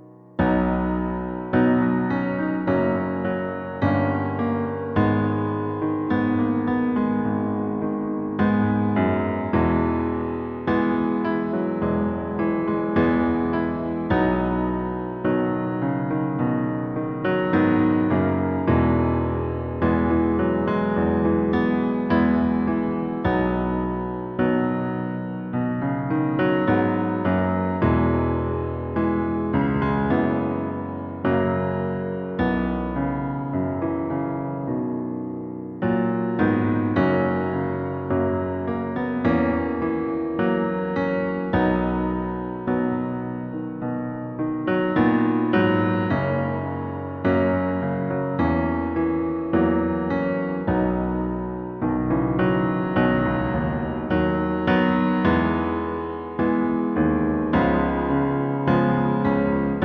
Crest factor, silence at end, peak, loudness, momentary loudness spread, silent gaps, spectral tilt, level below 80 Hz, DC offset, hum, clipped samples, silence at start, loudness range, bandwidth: 16 dB; 0 s; -6 dBFS; -23 LUFS; 7 LU; none; -10.5 dB/octave; -40 dBFS; under 0.1%; none; under 0.1%; 0 s; 3 LU; 5.6 kHz